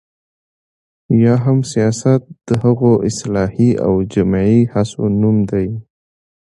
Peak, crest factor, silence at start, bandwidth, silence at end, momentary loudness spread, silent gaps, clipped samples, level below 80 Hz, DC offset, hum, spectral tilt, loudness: 0 dBFS; 14 dB; 1.1 s; 11.5 kHz; 0.65 s; 6 LU; none; under 0.1%; -42 dBFS; under 0.1%; none; -7.5 dB/octave; -15 LUFS